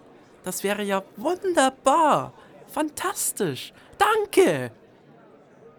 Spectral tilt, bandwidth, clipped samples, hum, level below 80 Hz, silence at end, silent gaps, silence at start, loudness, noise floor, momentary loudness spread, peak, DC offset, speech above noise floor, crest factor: -3.5 dB/octave; 19.5 kHz; under 0.1%; none; -64 dBFS; 0.1 s; none; 0.45 s; -23 LUFS; -52 dBFS; 15 LU; -4 dBFS; under 0.1%; 29 dB; 20 dB